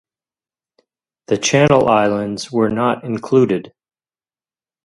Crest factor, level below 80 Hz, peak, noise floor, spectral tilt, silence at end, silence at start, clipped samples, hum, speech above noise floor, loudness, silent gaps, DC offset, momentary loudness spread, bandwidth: 18 dB; -52 dBFS; 0 dBFS; under -90 dBFS; -5 dB/octave; 1.15 s; 1.3 s; under 0.1%; none; over 75 dB; -16 LUFS; none; under 0.1%; 10 LU; 11.5 kHz